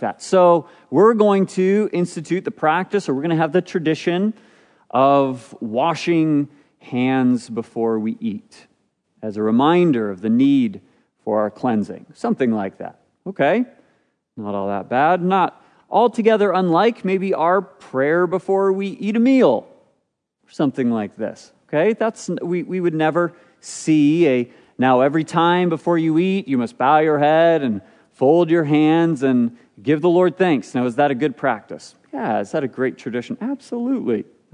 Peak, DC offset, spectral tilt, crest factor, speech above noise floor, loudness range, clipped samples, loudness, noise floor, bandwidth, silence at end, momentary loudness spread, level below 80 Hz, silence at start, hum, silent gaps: -2 dBFS; under 0.1%; -7 dB/octave; 16 dB; 53 dB; 5 LU; under 0.1%; -19 LUFS; -71 dBFS; 10.5 kHz; 0.3 s; 12 LU; -74 dBFS; 0 s; none; none